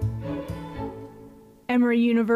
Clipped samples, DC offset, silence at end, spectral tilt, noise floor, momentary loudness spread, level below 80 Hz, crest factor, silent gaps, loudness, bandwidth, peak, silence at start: under 0.1%; under 0.1%; 0 s; -8 dB/octave; -48 dBFS; 20 LU; -46 dBFS; 12 dB; none; -25 LUFS; 5.2 kHz; -12 dBFS; 0 s